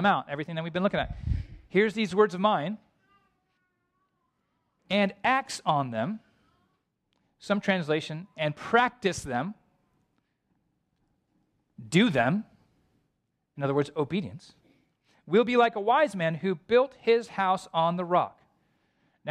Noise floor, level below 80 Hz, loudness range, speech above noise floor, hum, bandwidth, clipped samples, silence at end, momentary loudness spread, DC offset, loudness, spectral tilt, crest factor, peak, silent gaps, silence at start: -78 dBFS; -50 dBFS; 6 LU; 52 dB; none; 12.5 kHz; under 0.1%; 0 s; 10 LU; under 0.1%; -27 LUFS; -5.5 dB/octave; 20 dB; -8 dBFS; none; 0 s